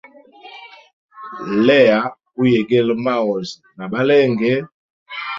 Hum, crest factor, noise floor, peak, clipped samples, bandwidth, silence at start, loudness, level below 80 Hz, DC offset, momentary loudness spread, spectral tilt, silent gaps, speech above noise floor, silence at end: none; 16 dB; -42 dBFS; -2 dBFS; under 0.1%; 7.6 kHz; 0.45 s; -16 LUFS; -60 dBFS; under 0.1%; 24 LU; -7 dB/octave; 0.93-1.09 s, 4.74-5.06 s; 26 dB; 0 s